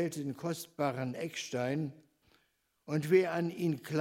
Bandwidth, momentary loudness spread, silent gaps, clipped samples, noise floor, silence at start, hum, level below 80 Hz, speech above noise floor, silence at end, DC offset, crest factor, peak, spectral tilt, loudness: 16 kHz; 10 LU; none; under 0.1%; -76 dBFS; 0 s; none; -78 dBFS; 43 dB; 0 s; under 0.1%; 20 dB; -14 dBFS; -6 dB/octave; -34 LUFS